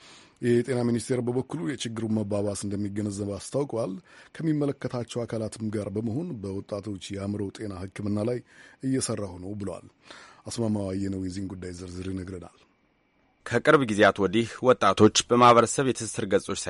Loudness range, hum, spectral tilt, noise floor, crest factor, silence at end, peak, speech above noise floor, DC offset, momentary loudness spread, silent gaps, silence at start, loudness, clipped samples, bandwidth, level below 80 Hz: 12 LU; none; -5 dB/octave; -67 dBFS; 20 dB; 0 s; -6 dBFS; 41 dB; under 0.1%; 16 LU; none; 0.05 s; -26 LUFS; under 0.1%; 11.5 kHz; -60 dBFS